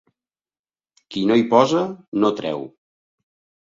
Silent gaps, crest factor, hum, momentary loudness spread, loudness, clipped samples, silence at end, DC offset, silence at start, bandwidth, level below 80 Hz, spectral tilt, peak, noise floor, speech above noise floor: 2.08-2.12 s; 22 dB; none; 15 LU; -19 LUFS; under 0.1%; 0.95 s; under 0.1%; 1.1 s; 7.6 kHz; -64 dBFS; -6 dB/octave; 0 dBFS; under -90 dBFS; over 71 dB